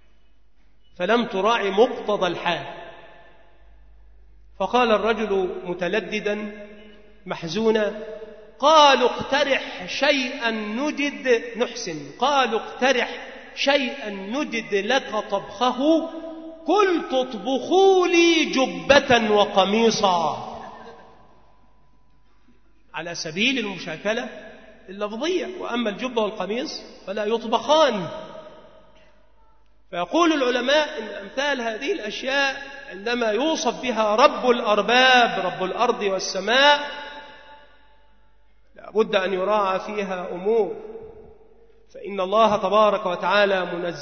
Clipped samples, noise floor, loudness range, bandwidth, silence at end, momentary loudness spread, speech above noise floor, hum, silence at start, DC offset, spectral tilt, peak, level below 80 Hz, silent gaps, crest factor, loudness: under 0.1%; -60 dBFS; 8 LU; 6.6 kHz; 0 s; 17 LU; 39 dB; none; 1 s; 0.3%; -3.5 dB/octave; 0 dBFS; -56 dBFS; none; 22 dB; -21 LUFS